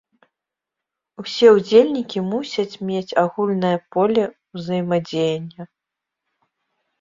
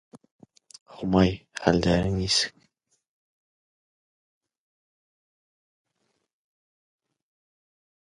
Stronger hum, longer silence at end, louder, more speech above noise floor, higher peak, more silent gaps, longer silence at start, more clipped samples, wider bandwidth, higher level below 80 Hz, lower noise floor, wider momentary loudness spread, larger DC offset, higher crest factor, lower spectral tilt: neither; second, 1.35 s vs 5.55 s; first, -19 LUFS vs -24 LUFS; first, 66 dB vs 53 dB; about the same, -2 dBFS vs -4 dBFS; second, none vs 0.31-0.39 s, 0.81-0.86 s; first, 1.2 s vs 0.15 s; neither; second, 7.6 kHz vs 11.5 kHz; second, -64 dBFS vs -46 dBFS; first, -85 dBFS vs -76 dBFS; first, 15 LU vs 6 LU; neither; second, 20 dB vs 28 dB; first, -6.5 dB/octave vs -5 dB/octave